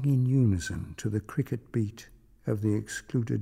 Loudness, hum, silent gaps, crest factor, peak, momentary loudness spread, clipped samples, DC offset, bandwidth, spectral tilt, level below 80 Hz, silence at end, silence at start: -30 LUFS; none; none; 14 dB; -14 dBFS; 11 LU; under 0.1%; under 0.1%; 15 kHz; -7 dB/octave; -52 dBFS; 0 s; 0 s